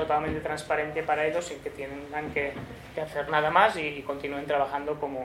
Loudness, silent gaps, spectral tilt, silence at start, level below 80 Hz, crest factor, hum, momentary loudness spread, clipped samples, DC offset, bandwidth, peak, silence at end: -28 LUFS; none; -4.5 dB/octave; 0 s; -54 dBFS; 22 dB; none; 14 LU; under 0.1%; under 0.1%; 16 kHz; -6 dBFS; 0 s